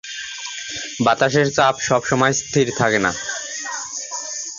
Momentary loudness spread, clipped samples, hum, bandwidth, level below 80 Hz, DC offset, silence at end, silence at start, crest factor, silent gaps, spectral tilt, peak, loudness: 11 LU; under 0.1%; none; 7.6 kHz; -54 dBFS; under 0.1%; 0 s; 0.05 s; 18 dB; none; -3.5 dB/octave; -2 dBFS; -20 LUFS